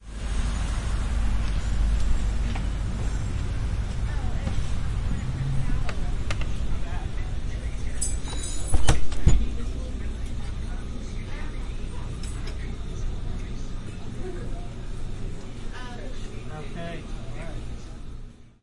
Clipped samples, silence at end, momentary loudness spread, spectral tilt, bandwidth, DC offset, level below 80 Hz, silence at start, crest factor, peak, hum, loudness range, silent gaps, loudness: under 0.1%; 0.15 s; 11 LU; -5 dB/octave; 11.5 kHz; under 0.1%; -28 dBFS; 0 s; 22 dB; -2 dBFS; none; 8 LU; none; -31 LUFS